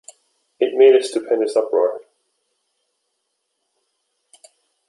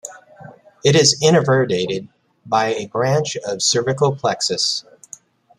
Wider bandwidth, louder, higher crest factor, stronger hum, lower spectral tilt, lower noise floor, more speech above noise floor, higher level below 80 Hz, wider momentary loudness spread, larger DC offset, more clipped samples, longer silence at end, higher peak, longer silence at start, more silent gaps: second, 11.5 kHz vs 13 kHz; about the same, -17 LUFS vs -17 LUFS; about the same, 18 dB vs 18 dB; neither; about the same, -3 dB/octave vs -3.5 dB/octave; first, -74 dBFS vs -44 dBFS; first, 58 dB vs 26 dB; second, -76 dBFS vs -58 dBFS; about the same, 10 LU vs 11 LU; neither; neither; first, 2.9 s vs 0.75 s; about the same, -2 dBFS vs -2 dBFS; first, 0.6 s vs 0.05 s; neither